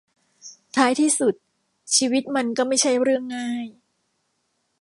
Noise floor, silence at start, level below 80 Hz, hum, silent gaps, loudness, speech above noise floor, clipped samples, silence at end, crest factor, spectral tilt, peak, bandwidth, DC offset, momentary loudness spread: -72 dBFS; 0.45 s; -78 dBFS; none; none; -21 LUFS; 51 dB; under 0.1%; 1.1 s; 20 dB; -2 dB/octave; -4 dBFS; 11.5 kHz; under 0.1%; 10 LU